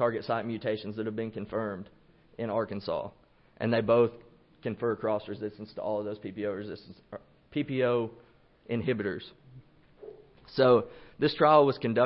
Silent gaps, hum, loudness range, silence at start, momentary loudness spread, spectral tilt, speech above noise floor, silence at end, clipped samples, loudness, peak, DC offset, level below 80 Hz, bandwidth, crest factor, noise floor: none; none; 6 LU; 0 s; 21 LU; -10.5 dB/octave; 26 dB; 0 s; under 0.1%; -30 LUFS; -8 dBFS; under 0.1%; -66 dBFS; 5.8 kHz; 22 dB; -55 dBFS